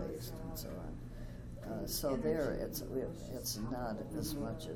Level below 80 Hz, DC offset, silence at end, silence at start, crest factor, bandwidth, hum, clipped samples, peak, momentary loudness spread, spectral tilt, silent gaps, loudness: -50 dBFS; under 0.1%; 0 s; 0 s; 16 dB; 19.5 kHz; none; under 0.1%; -24 dBFS; 12 LU; -5 dB/octave; none; -40 LUFS